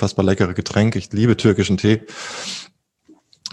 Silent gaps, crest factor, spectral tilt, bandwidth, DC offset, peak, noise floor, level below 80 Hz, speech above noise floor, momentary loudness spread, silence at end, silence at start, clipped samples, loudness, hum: none; 18 dB; -6 dB/octave; 11 kHz; under 0.1%; -2 dBFS; -54 dBFS; -48 dBFS; 36 dB; 13 LU; 0.05 s; 0 s; under 0.1%; -19 LUFS; none